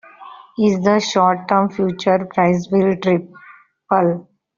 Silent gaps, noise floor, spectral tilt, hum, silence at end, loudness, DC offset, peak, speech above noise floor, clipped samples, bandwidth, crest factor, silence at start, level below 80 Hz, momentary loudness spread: none; -40 dBFS; -5.5 dB/octave; none; 0.35 s; -17 LUFS; under 0.1%; -2 dBFS; 24 dB; under 0.1%; 7.4 kHz; 16 dB; 0.2 s; -58 dBFS; 5 LU